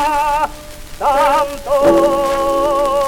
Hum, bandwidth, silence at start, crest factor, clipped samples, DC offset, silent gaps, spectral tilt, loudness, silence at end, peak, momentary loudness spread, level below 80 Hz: none; 18 kHz; 0 s; 12 dB; under 0.1%; under 0.1%; none; -4 dB/octave; -15 LUFS; 0 s; -2 dBFS; 9 LU; -34 dBFS